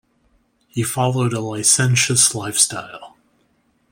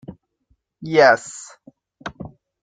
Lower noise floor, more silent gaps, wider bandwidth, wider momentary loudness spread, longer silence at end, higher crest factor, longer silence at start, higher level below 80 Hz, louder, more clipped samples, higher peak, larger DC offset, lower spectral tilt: second, -62 dBFS vs -66 dBFS; neither; first, 16.5 kHz vs 9.4 kHz; second, 14 LU vs 25 LU; first, 0.85 s vs 0.35 s; about the same, 20 dB vs 22 dB; first, 0.75 s vs 0.1 s; about the same, -58 dBFS vs -58 dBFS; about the same, -16 LUFS vs -16 LUFS; neither; about the same, 0 dBFS vs 0 dBFS; neither; about the same, -3 dB/octave vs -4 dB/octave